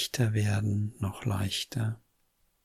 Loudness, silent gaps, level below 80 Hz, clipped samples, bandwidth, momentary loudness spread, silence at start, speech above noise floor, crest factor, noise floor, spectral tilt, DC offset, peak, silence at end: -31 LUFS; none; -58 dBFS; under 0.1%; 15 kHz; 7 LU; 0 s; 42 dB; 16 dB; -71 dBFS; -5 dB/octave; under 0.1%; -16 dBFS; 0.65 s